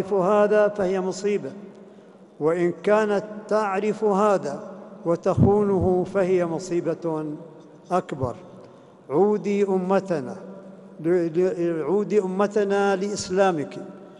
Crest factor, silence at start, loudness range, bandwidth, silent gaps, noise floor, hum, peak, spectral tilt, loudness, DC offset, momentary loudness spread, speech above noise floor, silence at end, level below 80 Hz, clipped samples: 18 dB; 0 s; 4 LU; 11 kHz; none; -48 dBFS; none; -4 dBFS; -7 dB/octave; -23 LUFS; under 0.1%; 14 LU; 26 dB; 0 s; -52 dBFS; under 0.1%